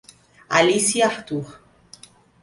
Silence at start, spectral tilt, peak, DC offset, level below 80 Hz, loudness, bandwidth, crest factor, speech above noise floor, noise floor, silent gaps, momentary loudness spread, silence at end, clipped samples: 0.5 s; -3 dB/octave; -2 dBFS; under 0.1%; -60 dBFS; -20 LUFS; 11.5 kHz; 20 dB; 29 dB; -49 dBFS; none; 13 LU; 0.9 s; under 0.1%